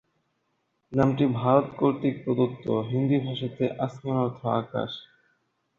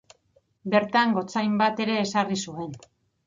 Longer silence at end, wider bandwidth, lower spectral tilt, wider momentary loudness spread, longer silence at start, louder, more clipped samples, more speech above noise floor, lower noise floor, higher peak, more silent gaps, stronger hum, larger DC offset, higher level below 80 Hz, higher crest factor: first, 0.75 s vs 0.5 s; second, 7 kHz vs 9 kHz; first, -9 dB/octave vs -5 dB/octave; second, 9 LU vs 14 LU; first, 0.9 s vs 0.65 s; about the same, -26 LUFS vs -24 LUFS; neither; first, 49 dB vs 41 dB; first, -75 dBFS vs -66 dBFS; about the same, -6 dBFS vs -8 dBFS; neither; neither; neither; first, -60 dBFS vs -68 dBFS; about the same, 22 dB vs 18 dB